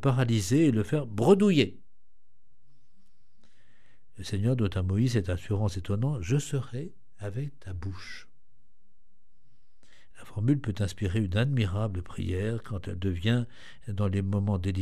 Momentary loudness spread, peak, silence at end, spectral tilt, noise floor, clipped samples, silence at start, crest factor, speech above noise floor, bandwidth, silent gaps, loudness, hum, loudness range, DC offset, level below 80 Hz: 15 LU; -8 dBFS; 0 s; -7 dB/octave; -73 dBFS; under 0.1%; 0 s; 22 dB; 46 dB; 13.5 kHz; none; -28 LUFS; none; 9 LU; 0.9%; -52 dBFS